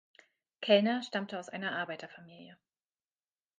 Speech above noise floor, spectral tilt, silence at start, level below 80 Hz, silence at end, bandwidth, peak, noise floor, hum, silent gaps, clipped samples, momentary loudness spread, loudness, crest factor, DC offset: over 57 dB; -5 dB/octave; 0.6 s; -88 dBFS; 1.05 s; 9.4 kHz; -12 dBFS; under -90 dBFS; none; none; under 0.1%; 23 LU; -32 LUFS; 24 dB; under 0.1%